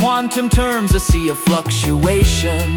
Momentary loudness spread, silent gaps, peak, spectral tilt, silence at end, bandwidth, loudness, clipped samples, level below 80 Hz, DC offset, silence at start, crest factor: 3 LU; none; -2 dBFS; -5 dB/octave; 0 s; 18 kHz; -16 LUFS; under 0.1%; -22 dBFS; under 0.1%; 0 s; 12 dB